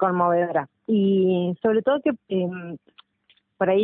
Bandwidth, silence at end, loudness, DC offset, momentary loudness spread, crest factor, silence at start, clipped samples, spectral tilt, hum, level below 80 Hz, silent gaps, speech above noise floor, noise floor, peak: 3.9 kHz; 0 s; -23 LUFS; under 0.1%; 10 LU; 16 dB; 0 s; under 0.1%; -12 dB/octave; none; -68 dBFS; none; 42 dB; -64 dBFS; -8 dBFS